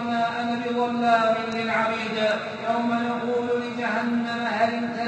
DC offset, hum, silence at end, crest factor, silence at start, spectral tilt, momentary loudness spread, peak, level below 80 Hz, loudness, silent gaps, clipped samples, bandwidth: under 0.1%; none; 0 s; 16 dB; 0 s; -5 dB/octave; 5 LU; -8 dBFS; -68 dBFS; -24 LUFS; none; under 0.1%; 8.4 kHz